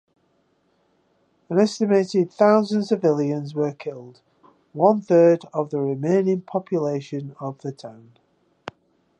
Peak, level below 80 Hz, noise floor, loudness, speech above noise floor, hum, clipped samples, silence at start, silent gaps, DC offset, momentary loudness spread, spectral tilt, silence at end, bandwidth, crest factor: -4 dBFS; -74 dBFS; -66 dBFS; -21 LUFS; 45 dB; none; under 0.1%; 1.5 s; none; under 0.1%; 23 LU; -7.5 dB/octave; 1.25 s; 9.2 kHz; 20 dB